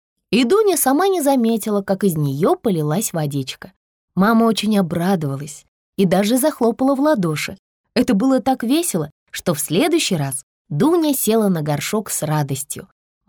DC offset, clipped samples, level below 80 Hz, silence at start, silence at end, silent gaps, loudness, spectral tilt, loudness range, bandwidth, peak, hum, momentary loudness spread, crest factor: under 0.1%; under 0.1%; -56 dBFS; 0.3 s; 0.45 s; 3.76-4.08 s, 5.68-5.93 s, 7.59-7.84 s, 9.12-9.26 s, 10.43-10.65 s; -18 LUFS; -5 dB/octave; 2 LU; over 20 kHz; -6 dBFS; none; 12 LU; 12 dB